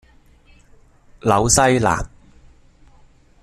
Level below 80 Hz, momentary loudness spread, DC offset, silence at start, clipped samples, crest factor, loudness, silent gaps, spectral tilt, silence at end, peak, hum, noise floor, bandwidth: -38 dBFS; 11 LU; under 0.1%; 1.25 s; under 0.1%; 22 dB; -17 LUFS; none; -4 dB/octave; 1.35 s; 0 dBFS; none; -50 dBFS; 14 kHz